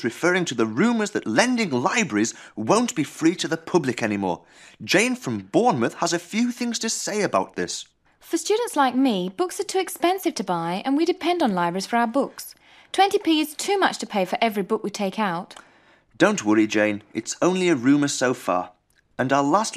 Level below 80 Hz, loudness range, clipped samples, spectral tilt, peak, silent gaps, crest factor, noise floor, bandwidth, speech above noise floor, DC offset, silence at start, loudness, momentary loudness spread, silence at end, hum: -68 dBFS; 2 LU; under 0.1%; -4 dB/octave; -2 dBFS; none; 22 dB; -56 dBFS; 15.5 kHz; 33 dB; under 0.1%; 0 s; -23 LUFS; 9 LU; 0 s; none